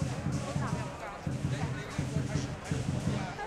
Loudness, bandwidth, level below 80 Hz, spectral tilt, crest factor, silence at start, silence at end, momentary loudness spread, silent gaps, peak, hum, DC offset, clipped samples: -35 LUFS; 12.5 kHz; -50 dBFS; -6 dB/octave; 14 dB; 0 s; 0 s; 4 LU; none; -18 dBFS; none; under 0.1%; under 0.1%